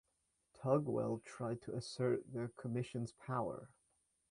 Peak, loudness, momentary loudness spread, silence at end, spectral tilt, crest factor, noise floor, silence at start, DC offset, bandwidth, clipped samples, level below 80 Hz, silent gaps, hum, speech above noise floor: -20 dBFS; -41 LUFS; 9 LU; 0.65 s; -7 dB/octave; 22 dB; -83 dBFS; 0.6 s; under 0.1%; 11 kHz; under 0.1%; -74 dBFS; none; none; 43 dB